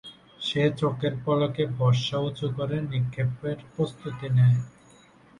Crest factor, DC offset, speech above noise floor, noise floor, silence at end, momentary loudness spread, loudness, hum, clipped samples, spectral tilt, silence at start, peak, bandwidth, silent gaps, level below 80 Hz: 16 dB; under 0.1%; 30 dB; -55 dBFS; 0.7 s; 11 LU; -26 LUFS; none; under 0.1%; -7 dB/octave; 0.05 s; -10 dBFS; 9.8 kHz; none; -58 dBFS